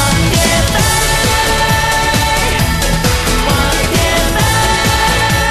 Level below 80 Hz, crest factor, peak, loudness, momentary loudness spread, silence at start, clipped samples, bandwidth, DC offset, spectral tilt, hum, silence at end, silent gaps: -20 dBFS; 12 dB; 0 dBFS; -11 LUFS; 2 LU; 0 s; under 0.1%; 13.5 kHz; under 0.1%; -3.5 dB/octave; none; 0 s; none